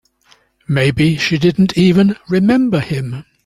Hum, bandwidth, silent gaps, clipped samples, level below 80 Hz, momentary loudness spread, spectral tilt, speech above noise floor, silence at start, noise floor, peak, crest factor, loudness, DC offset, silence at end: none; 12 kHz; none; under 0.1%; -44 dBFS; 9 LU; -7 dB/octave; 40 dB; 0.7 s; -53 dBFS; -2 dBFS; 12 dB; -14 LUFS; under 0.1%; 0.25 s